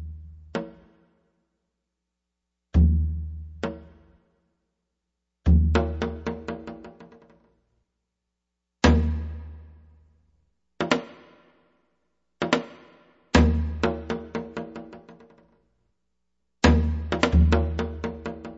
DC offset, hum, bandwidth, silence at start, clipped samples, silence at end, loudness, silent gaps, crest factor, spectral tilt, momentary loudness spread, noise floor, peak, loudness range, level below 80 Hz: under 0.1%; none; 8 kHz; 0 s; under 0.1%; 0 s; -25 LUFS; none; 24 dB; -6.5 dB/octave; 21 LU; -82 dBFS; -4 dBFS; 6 LU; -30 dBFS